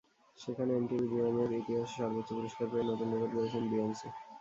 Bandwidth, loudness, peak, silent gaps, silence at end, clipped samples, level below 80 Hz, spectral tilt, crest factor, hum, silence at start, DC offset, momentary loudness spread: 7.8 kHz; -35 LUFS; -22 dBFS; none; 0 s; under 0.1%; -70 dBFS; -7 dB/octave; 14 dB; none; 0.4 s; under 0.1%; 8 LU